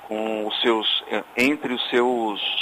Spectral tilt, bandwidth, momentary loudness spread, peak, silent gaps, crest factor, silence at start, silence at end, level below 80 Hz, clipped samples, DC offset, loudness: -3.5 dB/octave; 16 kHz; 6 LU; -8 dBFS; none; 16 dB; 0 s; 0 s; -66 dBFS; under 0.1%; under 0.1%; -22 LUFS